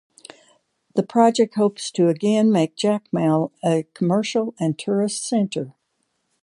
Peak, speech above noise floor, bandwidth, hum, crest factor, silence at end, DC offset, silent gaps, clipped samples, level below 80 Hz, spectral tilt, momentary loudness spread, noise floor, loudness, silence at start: -2 dBFS; 52 dB; 11.5 kHz; none; 18 dB; 0.7 s; under 0.1%; none; under 0.1%; -70 dBFS; -6 dB/octave; 8 LU; -72 dBFS; -21 LUFS; 0.95 s